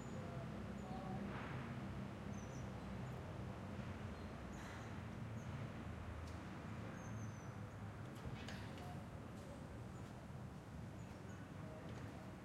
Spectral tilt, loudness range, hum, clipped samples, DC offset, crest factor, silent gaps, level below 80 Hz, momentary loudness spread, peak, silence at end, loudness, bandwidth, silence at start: -6.5 dB/octave; 3 LU; none; under 0.1%; under 0.1%; 14 dB; none; -62 dBFS; 5 LU; -36 dBFS; 0 s; -51 LUFS; 16 kHz; 0 s